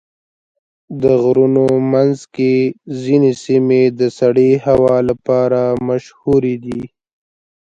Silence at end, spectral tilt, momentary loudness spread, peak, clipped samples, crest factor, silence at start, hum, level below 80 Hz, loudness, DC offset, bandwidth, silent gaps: 0.8 s; -8 dB/octave; 8 LU; 0 dBFS; under 0.1%; 14 dB; 0.9 s; none; -48 dBFS; -14 LUFS; under 0.1%; 8 kHz; none